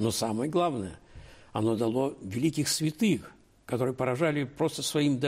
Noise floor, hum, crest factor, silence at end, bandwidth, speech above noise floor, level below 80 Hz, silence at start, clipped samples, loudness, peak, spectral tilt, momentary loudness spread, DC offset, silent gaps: -50 dBFS; none; 14 dB; 0 s; 16 kHz; 22 dB; -60 dBFS; 0 s; under 0.1%; -29 LUFS; -16 dBFS; -5 dB/octave; 6 LU; under 0.1%; none